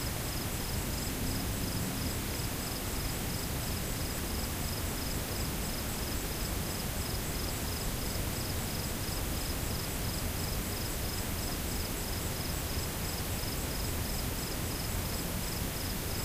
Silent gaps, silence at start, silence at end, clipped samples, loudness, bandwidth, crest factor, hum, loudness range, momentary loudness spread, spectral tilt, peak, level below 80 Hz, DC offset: none; 0 s; 0 s; under 0.1%; -35 LUFS; 16 kHz; 14 dB; none; 0 LU; 1 LU; -3.5 dB/octave; -22 dBFS; -40 dBFS; under 0.1%